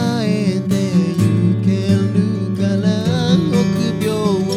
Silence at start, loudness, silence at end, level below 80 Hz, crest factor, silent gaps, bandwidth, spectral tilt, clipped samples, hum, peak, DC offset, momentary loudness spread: 0 s; -16 LUFS; 0 s; -48 dBFS; 14 dB; none; 14.5 kHz; -7 dB/octave; under 0.1%; none; -2 dBFS; under 0.1%; 3 LU